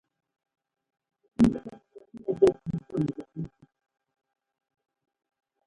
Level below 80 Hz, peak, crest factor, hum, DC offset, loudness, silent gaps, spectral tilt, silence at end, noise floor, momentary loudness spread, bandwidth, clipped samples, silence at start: -54 dBFS; -8 dBFS; 24 dB; none; under 0.1%; -27 LUFS; none; -8.5 dB/octave; 2.2 s; -49 dBFS; 17 LU; 11.5 kHz; under 0.1%; 1.4 s